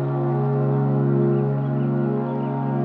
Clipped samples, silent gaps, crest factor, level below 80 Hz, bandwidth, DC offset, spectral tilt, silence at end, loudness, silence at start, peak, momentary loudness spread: under 0.1%; none; 12 dB; -64 dBFS; 3.4 kHz; under 0.1%; -12.5 dB/octave; 0 s; -22 LUFS; 0 s; -10 dBFS; 4 LU